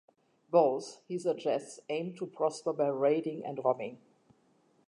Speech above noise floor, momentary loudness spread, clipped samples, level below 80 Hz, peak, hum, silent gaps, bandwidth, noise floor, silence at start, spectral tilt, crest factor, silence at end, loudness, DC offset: 37 dB; 11 LU; under 0.1%; -88 dBFS; -12 dBFS; none; none; 11 kHz; -69 dBFS; 0.5 s; -6 dB/octave; 20 dB; 0.9 s; -32 LUFS; under 0.1%